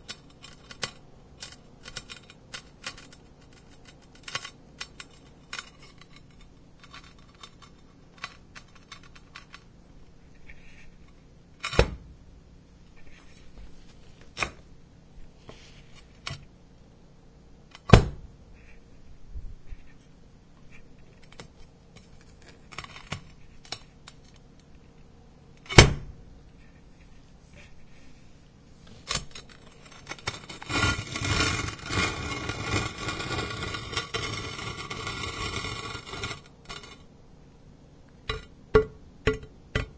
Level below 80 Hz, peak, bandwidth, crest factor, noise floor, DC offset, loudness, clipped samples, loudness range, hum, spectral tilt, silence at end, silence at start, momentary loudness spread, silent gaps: -42 dBFS; 0 dBFS; 8 kHz; 32 dB; -53 dBFS; under 0.1%; -29 LUFS; under 0.1%; 22 LU; none; -4 dB/octave; 0 s; 0.1 s; 26 LU; none